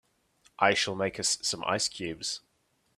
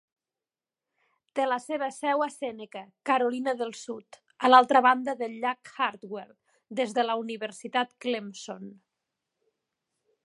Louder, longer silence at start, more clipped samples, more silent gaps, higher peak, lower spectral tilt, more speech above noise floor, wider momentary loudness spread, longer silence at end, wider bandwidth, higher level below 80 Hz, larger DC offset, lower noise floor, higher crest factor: about the same, -29 LUFS vs -27 LUFS; second, 0.6 s vs 1.35 s; neither; neither; second, -8 dBFS vs -4 dBFS; second, -2 dB/octave vs -3.5 dB/octave; second, 43 dB vs over 63 dB; second, 10 LU vs 20 LU; second, 0.6 s vs 1.5 s; first, 15 kHz vs 11.5 kHz; first, -66 dBFS vs -84 dBFS; neither; second, -73 dBFS vs under -90 dBFS; about the same, 24 dB vs 26 dB